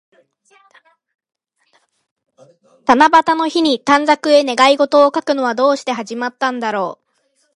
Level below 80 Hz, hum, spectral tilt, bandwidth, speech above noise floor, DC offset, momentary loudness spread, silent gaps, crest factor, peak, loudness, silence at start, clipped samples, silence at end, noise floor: -62 dBFS; none; -3 dB/octave; 11.5 kHz; 49 dB; under 0.1%; 11 LU; none; 16 dB; 0 dBFS; -14 LUFS; 2.9 s; under 0.1%; 0.6 s; -63 dBFS